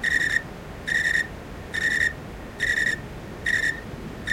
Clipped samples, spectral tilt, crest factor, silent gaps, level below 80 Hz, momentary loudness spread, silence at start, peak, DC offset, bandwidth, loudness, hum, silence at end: under 0.1%; -3 dB/octave; 18 dB; none; -44 dBFS; 16 LU; 0 s; -8 dBFS; under 0.1%; 16.5 kHz; -24 LUFS; none; 0 s